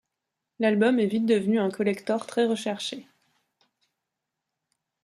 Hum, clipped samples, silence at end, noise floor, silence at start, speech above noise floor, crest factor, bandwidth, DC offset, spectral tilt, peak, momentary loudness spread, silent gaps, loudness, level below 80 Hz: none; under 0.1%; 2 s; -84 dBFS; 0.6 s; 60 dB; 18 dB; 12 kHz; under 0.1%; -5.5 dB/octave; -10 dBFS; 9 LU; none; -25 LUFS; -74 dBFS